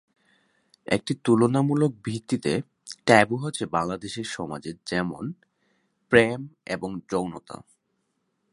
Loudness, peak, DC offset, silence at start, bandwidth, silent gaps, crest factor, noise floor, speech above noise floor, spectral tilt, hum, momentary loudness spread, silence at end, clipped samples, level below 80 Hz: -25 LUFS; 0 dBFS; under 0.1%; 0.9 s; 11.5 kHz; none; 26 dB; -75 dBFS; 50 dB; -5.5 dB/octave; none; 16 LU; 0.95 s; under 0.1%; -58 dBFS